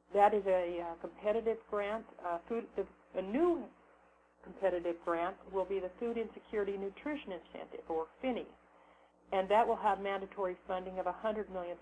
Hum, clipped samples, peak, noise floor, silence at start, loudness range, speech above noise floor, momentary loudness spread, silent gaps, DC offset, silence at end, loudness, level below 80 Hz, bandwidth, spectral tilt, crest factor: 60 Hz at -65 dBFS; under 0.1%; -16 dBFS; -66 dBFS; 0.1 s; 4 LU; 31 dB; 12 LU; none; under 0.1%; 0 s; -36 LUFS; -66 dBFS; 9.6 kHz; -7 dB/octave; 20 dB